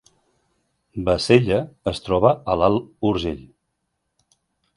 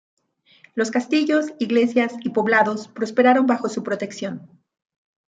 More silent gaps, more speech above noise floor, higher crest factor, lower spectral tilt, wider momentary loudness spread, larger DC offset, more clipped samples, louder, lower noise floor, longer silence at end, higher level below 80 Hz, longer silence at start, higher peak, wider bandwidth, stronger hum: neither; first, 56 dB vs 35 dB; about the same, 22 dB vs 18 dB; first, -6.5 dB/octave vs -5 dB/octave; about the same, 12 LU vs 12 LU; neither; neither; about the same, -20 LUFS vs -20 LUFS; first, -75 dBFS vs -55 dBFS; first, 1.35 s vs 0.9 s; first, -44 dBFS vs -74 dBFS; first, 0.95 s vs 0.75 s; first, 0 dBFS vs -4 dBFS; first, 11.5 kHz vs 9 kHz; neither